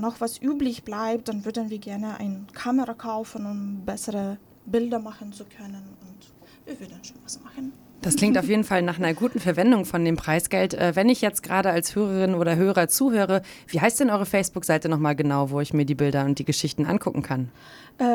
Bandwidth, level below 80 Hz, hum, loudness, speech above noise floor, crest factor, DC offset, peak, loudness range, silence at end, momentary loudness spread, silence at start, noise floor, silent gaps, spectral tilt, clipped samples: over 20 kHz; -56 dBFS; none; -24 LUFS; 27 dB; 18 dB; under 0.1%; -6 dBFS; 10 LU; 0 s; 17 LU; 0 s; -51 dBFS; none; -5 dB/octave; under 0.1%